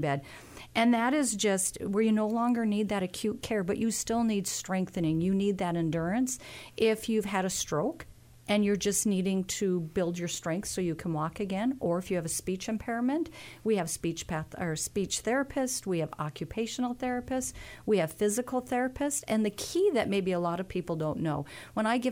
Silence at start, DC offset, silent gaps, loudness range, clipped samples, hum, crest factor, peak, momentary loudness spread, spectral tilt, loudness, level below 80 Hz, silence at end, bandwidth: 0 s; under 0.1%; none; 3 LU; under 0.1%; none; 16 dB; -14 dBFS; 7 LU; -4.5 dB/octave; -30 LUFS; -56 dBFS; 0 s; 16.5 kHz